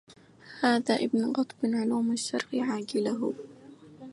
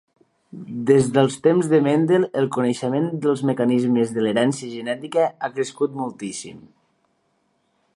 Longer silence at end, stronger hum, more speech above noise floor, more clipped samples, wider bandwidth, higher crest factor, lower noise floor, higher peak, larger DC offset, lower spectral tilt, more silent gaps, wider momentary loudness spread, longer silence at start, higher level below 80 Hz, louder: second, 0 s vs 1.35 s; neither; second, 24 dB vs 47 dB; neither; about the same, 11.5 kHz vs 11.5 kHz; about the same, 18 dB vs 18 dB; second, -52 dBFS vs -68 dBFS; second, -12 dBFS vs -2 dBFS; neither; second, -4.5 dB/octave vs -6 dB/octave; neither; about the same, 13 LU vs 11 LU; second, 0.1 s vs 0.55 s; second, -76 dBFS vs -66 dBFS; second, -29 LUFS vs -21 LUFS